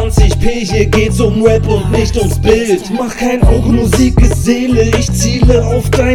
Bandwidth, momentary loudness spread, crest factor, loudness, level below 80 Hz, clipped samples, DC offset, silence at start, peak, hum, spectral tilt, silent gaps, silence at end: 16 kHz; 4 LU; 10 dB; -11 LUFS; -16 dBFS; 0.8%; under 0.1%; 0 s; 0 dBFS; none; -6 dB/octave; none; 0 s